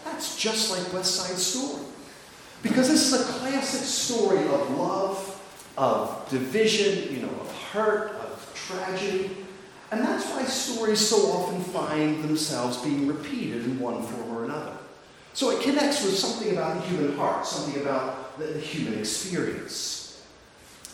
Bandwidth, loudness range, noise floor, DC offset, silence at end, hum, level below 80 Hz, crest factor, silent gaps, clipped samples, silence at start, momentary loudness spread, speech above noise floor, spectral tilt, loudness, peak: 18.5 kHz; 5 LU; -51 dBFS; under 0.1%; 0 s; none; -66 dBFS; 18 dB; none; under 0.1%; 0 s; 13 LU; 25 dB; -3 dB/octave; -26 LUFS; -8 dBFS